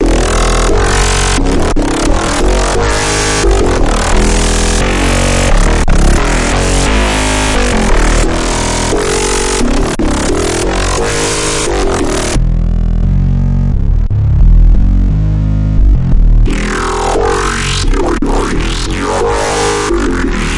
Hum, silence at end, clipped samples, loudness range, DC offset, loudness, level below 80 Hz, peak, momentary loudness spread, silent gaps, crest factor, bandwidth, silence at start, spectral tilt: none; 0 s; under 0.1%; 2 LU; under 0.1%; -12 LUFS; -12 dBFS; 0 dBFS; 3 LU; none; 10 dB; 11.5 kHz; 0 s; -4.5 dB/octave